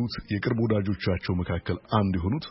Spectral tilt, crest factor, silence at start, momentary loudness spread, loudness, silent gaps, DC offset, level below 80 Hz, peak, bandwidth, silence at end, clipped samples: -11 dB/octave; 18 dB; 0 s; 5 LU; -27 LUFS; none; under 0.1%; -44 dBFS; -8 dBFS; 5.8 kHz; 0 s; under 0.1%